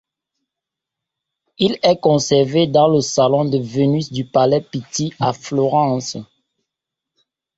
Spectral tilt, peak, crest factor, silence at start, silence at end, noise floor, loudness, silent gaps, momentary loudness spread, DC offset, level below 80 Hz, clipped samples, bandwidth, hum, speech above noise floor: -5.5 dB/octave; -2 dBFS; 16 dB; 1.6 s; 1.35 s; -84 dBFS; -17 LUFS; none; 9 LU; under 0.1%; -56 dBFS; under 0.1%; 8 kHz; none; 68 dB